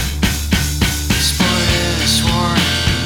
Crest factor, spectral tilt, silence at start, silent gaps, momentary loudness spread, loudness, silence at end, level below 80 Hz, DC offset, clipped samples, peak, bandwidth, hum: 14 dB; -3.5 dB/octave; 0 s; none; 4 LU; -15 LUFS; 0 s; -22 dBFS; under 0.1%; under 0.1%; 0 dBFS; 19 kHz; none